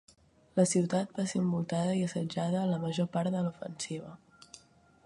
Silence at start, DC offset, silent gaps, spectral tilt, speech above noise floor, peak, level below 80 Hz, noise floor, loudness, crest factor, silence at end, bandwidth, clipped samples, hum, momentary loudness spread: 0.55 s; under 0.1%; none; -6 dB/octave; 31 dB; -12 dBFS; -70 dBFS; -62 dBFS; -32 LUFS; 20 dB; 0.5 s; 11.5 kHz; under 0.1%; none; 14 LU